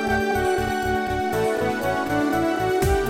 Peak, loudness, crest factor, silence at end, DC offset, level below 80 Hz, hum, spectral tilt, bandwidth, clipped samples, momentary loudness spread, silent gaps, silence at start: -8 dBFS; -23 LUFS; 14 dB; 0 s; under 0.1%; -36 dBFS; none; -5.5 dB/octave; 16.5 kHz; under 0.1%; 2 LU; none; 0 s